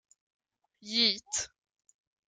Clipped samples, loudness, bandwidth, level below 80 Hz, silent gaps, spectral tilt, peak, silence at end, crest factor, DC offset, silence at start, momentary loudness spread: under 0.1%; -29 LUFS; 12 kHz; -74 dBFS; none; -0.5 dB/octave; -12 dBFS; 0.8 s; 24 dB; under 0.1%; 0.85 s; 17 LU